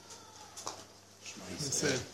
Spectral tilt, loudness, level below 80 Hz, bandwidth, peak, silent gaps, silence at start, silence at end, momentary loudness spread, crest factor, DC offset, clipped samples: -2.5 dB/octave; -37 LUFS; -70 dBFS; 16 kHz; -18 dBFS; none; 0 s; 0 s; 18 LU; 20 dB; under 0.1%; under 0.1%